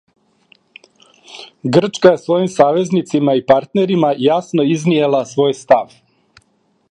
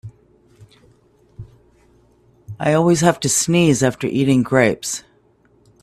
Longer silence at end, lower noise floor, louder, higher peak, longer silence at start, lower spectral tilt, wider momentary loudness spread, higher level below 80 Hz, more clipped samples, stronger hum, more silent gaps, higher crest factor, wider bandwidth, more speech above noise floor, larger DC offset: first, 1.05 s vs 0.85 s; first, -60 dBFS vs -56 dBFS; first, -14 LUFS vs -17 LUFS; about the same, 0 dBFS vs 0 dBFS; first, 1.3 s vs 0.05 s; first, -6.5 dB/octave vs -5 dB/octave; second, 4 LU vs 11 LU; second, -60 dBFS vs -52 dBFS; neither; neither; neither; about the same, 16 dB vs 20 dB; second, 10.5 kHz vs 15 kHz; first, 47 dB vs 40 dB; neither